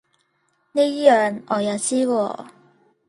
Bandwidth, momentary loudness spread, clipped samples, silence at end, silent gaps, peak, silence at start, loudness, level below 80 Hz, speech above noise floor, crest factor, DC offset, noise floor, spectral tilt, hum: 11.5 kHz; 11 LU; under 0.1%; 0.6 s; none; -2 dBFS; 0.75 s; -20 LUFS; -72 dBFS; 48 dB; 20 dB; under 0.1%; -67 dBFS; -4 dB/octave; none